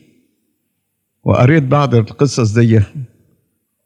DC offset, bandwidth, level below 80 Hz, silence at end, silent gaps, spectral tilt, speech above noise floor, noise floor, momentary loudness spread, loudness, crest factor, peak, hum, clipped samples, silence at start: under 0.1%; 9.8 kHz; -52 dBFS; 0.8 s; none; -7 dB/octave; 58 dB; -70 dBFS; 13 LU; -13 LUFS; 14 dB; 0 dBFS; none; under 0.1%; 1.25 s